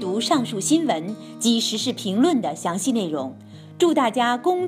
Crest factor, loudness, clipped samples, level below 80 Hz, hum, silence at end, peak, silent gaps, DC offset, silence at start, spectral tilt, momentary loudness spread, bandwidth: 16 dB; -22 LUFS; under 0.1%; -74 dBFS; none; 0 s; -6 dBFS; none; under 0.1%; 0 s; -4 dB/octave; 7 LU; 16 kHz